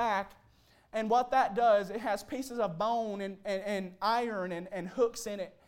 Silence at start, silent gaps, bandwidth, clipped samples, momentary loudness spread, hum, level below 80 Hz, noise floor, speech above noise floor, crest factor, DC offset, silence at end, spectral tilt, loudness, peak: 0 s; none; 16.5 kHz; under 0.1%; 11 LU; none; -66 dBFS; -64 dBFS; 33 dB; 16 dB; under 0.1%; 0.15 s; -4.5 dB/octave; -32 LUFS; -16 dBFS